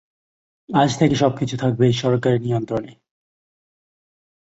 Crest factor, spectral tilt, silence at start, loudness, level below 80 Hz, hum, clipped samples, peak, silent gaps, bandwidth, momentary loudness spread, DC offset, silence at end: 18 dB; -6.5 dB/octave; 0.7 s; -20 LUFS; -54 dBFS; none; under 0.1%; -2 dBFS; none; 8 kHz; 6 LU; under 0.1%; 1.6 s